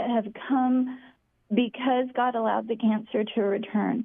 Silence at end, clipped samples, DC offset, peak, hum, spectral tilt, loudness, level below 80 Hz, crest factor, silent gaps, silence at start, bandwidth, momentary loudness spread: 0 s; under 0.1%; under 0.1%; -10 dBFS; none; -10 dB/octave; -26 LUFS; -72 dBFS; 16 dB; none; 0 s; 3.7 kHz; 4 LU